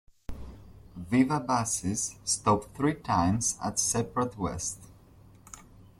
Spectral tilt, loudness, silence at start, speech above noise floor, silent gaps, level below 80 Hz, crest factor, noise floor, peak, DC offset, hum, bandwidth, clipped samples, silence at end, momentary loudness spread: -4 dB/octave; -28 LUFS; 0.3 s; 26 dB; none; -52 dBFS; 20 dB; -55 dBFS; -12 dBFS; under 0.1%; none; 14.5 kHz; under 0.1%; 0.15 s; 23 LU